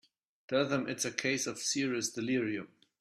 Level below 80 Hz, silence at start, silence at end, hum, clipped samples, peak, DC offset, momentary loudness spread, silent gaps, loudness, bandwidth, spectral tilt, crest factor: -76 dBFS; 0.5 s; 0.35 s; none; under 0.1%; -14 dBFS; under 0.1%; 5 LU; none; -33 LUFS; 14.5 kHz; -3 dB/octave; 22 dB